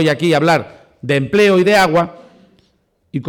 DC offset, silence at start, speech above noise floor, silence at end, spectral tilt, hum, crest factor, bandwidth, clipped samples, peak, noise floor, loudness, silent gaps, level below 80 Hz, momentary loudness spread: under 0.1%; 0 s; 47 dB; 0 s; -5.5 dB/octave; none; 10 dB; 19 kHz; under 0.1%; -6 dBFS; -60 dBFS; -13 LUFS; none; -50 dBFS; 13 LU